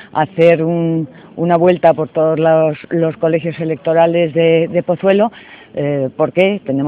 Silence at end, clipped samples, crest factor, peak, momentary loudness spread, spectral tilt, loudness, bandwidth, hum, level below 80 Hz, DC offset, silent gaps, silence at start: 0 s; under 0.1%; 14 dB; 0 dBFS; 8 LU; -9.5 dB/octave; -14 LUFS; 4.7 kHz; none; -58 dBFS; under 0.1%; none; 0 s